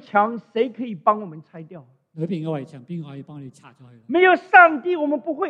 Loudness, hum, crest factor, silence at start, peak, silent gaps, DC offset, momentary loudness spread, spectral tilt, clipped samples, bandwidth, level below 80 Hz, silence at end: -19 LUFS; none; 20 dB; 0.15 s; 0 dBFS; none; under 0.1%; 26 LU; -7.5 dB/octave; under 0.1%; 8 kHz; -76 dBFS; 0 s